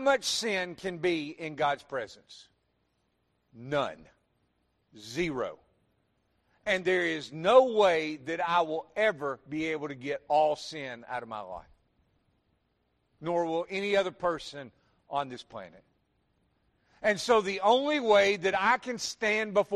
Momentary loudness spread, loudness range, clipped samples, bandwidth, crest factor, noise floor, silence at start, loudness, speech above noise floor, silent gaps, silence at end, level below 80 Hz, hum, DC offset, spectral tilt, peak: 15 LU; 10 LU; under 0.1%; 13 kHz; 22 dB; -75 dBFS; 0 s; -29 LUFS; 46 dB; none; 0 s; -66 dBFS; none; under 0.1%; -3.5 dB/octave; -8 dBFS